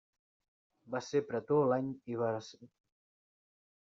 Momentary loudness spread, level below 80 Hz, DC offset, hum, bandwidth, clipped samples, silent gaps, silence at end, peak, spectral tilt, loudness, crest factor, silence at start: 12 LU; -78 dBFS; under 0.1%; none; 7.6 kHz; under 0.1%; none; 1.25 s; -20 dBFS; -6.5 dB/octave; -35 LUFS; 18 dB; 0.85 s